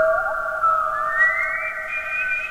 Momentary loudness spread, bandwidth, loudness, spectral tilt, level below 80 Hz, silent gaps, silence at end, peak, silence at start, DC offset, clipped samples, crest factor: 7 LU; 16 kHz; -20 LUFS; -3 dB/octave; -48 dBFS; none; 0 s; -6 dBFS; 0 s; under 0.1%; under 0.1%; 14 dB